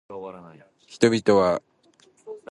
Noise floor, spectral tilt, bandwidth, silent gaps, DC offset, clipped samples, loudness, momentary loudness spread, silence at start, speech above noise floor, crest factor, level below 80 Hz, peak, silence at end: -59 dBFS; -5.5 dB/octave; 11.5 kHz; none; under 0.1%; under 0.1%; -21 LUFS; 22 LU; 0.1 s; 36 dB; 22 dB; -58 dBFS; -4 dBFS; 0.15 s